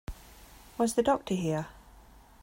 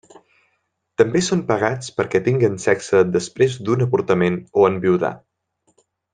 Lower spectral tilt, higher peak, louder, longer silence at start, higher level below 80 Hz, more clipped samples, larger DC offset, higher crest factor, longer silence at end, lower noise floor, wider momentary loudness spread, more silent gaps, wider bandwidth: about the same, -5.5 dB/octave vs -6 dB/octave; second, -14 dBFS vs -2 dBFS; second, -30 LUFS vs -19 LUFS; second, 0.1 s vs 1 s; first, -52 dBFS vs -58 dBFS; neither; neither; about the same, 18 dB vs 18 dB; second, 0.4 s vs 0.95 s; second, -55 dBFS vs -71 dBFS; first, 19 LU vs 4 LU; neither; first, 16 kHz vs 9.8 kHz